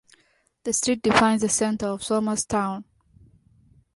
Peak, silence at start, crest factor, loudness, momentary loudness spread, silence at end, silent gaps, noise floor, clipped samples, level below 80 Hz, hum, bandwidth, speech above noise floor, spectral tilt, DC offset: -4 dBFS; 0.65 s; 22 dB; -23 LUFS; 10 LU; 1.15 s; none; -65 dBFS; under 0.1%; -54 dBFS; none; 11.5 kHz; 43 dB; -3.5 dB/octave; under 0.1%